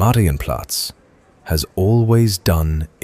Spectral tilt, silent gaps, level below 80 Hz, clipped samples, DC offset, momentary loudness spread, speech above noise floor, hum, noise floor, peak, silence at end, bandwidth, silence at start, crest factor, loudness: -5.5 dB/octave; none; -30 dBFS; under 0.1%; under 0.1%; 9 LU; 35 dB; none; -51 dBFS; -2 dBFS; 0.2 s; 16 kHz; 0 s; 14 dB; -18 LUFS